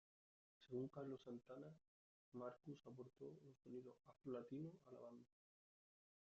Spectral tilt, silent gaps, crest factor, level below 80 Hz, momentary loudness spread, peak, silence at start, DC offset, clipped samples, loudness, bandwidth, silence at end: -8 dB/octave; 1.88-2.32 s; 20 dB; under -90 dBFS; 11 LU; -38 dBFS; 0.6 s; under 0.1%; under 0.1%; -57 LUFS; 7.4 kHz; 1.1 s